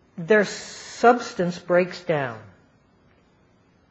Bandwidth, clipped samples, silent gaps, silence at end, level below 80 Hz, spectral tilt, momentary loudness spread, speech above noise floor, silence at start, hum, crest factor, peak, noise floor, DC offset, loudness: 8.4 kHz; under 0.1%; none; 1.5 s; -66 dBFS; -5 dB/octave; 15 LU; 38 dB; 0.15 s; none; 22 dB; -2 dBFS; -59 dBFS; under 0.1%; -22 LUFS